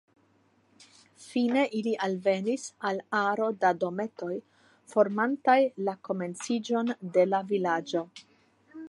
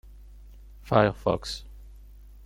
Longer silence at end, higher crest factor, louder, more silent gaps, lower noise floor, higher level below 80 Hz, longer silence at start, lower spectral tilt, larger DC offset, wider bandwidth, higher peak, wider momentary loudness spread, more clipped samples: second, 0 s vs 0.5 s; about the same, 20 dB vs 24 dB; about the same, -28 LUFS vs -26 LUFS; neither; first, -66 dBFS vs -48 dBFS; second, -82 dBFS vs -46 dBFS; first, 0.8 s vs 0.05 s; about the same, -5.5 dB/octave vs -6 dB/octave; neither; second, 11.5 kHz vs 16.5 kHz; second, -10 dBFS vs -6 dBFS; second, 9 LU vs 14 LU; neither